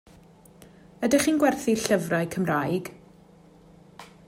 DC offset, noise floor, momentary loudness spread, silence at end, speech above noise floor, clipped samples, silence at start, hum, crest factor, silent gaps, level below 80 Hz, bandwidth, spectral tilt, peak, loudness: under 0.1%; -53 dBFS; 9 LU; 0.25 s; 29 dB; under 0.1%; 1 s; none; 18 dB; none; -60 dBFS; 16 kHz; -5 dB/octave; -8 dBFS; -24 LUFS